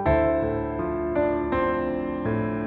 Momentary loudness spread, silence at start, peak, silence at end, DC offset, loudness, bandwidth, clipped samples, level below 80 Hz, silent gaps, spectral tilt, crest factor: 6 LU; 0 s; -10 dBFS; 0 s; under 0.1%; -25 LUFS; 4.5 kHz; under 0.1%; -38 dBFS; none; -11 dB/octave; 16 dB